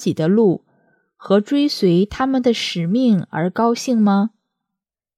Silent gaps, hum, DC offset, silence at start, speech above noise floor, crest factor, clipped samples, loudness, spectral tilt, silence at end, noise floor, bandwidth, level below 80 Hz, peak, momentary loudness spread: none; none; under 0.1%; 0 s; 67 dB; 16 dB; under 0.1%; -18 LUFS; -6.5 dB/octave; 0.9 s; -83 dBFS; 13.5 kHz; -52 dBFS; -2 dBFS; 4 LU